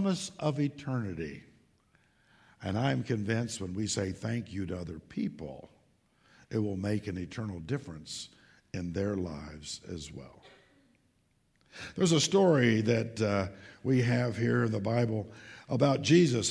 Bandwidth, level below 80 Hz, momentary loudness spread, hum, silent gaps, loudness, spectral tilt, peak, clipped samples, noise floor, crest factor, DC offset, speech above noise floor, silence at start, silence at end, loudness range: 11 kHz; -60 dBFS; 18 LU; none; none; -31 LUFS; -5.5 dB/octave; -12 dBFS; under 0.1%; -71 dBFS; 20 dB; under 0.1%; 41 dB; 0 s; 0 s; 10 LU